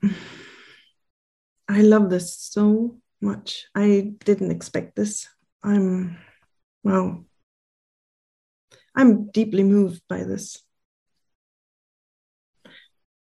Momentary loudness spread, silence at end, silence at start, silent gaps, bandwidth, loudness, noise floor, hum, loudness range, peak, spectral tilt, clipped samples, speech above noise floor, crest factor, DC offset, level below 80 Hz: 16 LU; 2.7 s; 0.05 s; 1.10-1.56 s, 5.52-5.60 s, 6.63-6.81 s, 7.43-8.68 s; 12 kHz; -21 LUFS; -53 dBFS; none; 6 LU; -4 dBFS; -6.5 dB/octave; under 0.1%; 33 dB; 20 dB; under 0.1%; -64 dBFS